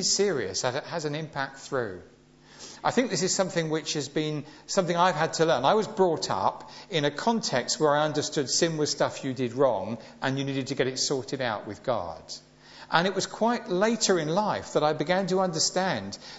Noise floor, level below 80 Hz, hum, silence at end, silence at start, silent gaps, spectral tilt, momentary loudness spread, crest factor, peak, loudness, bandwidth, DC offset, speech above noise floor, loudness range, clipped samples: -50 dBFS; -64 dBFS; none; 0 s; 0 s; none; -3.5 dB/octave; 9 LU; 22 dB; -4 dBFS; -27 LUFS; 8.2 kHz; under 0.1%; 23 dB; 4 LU; under 0.1%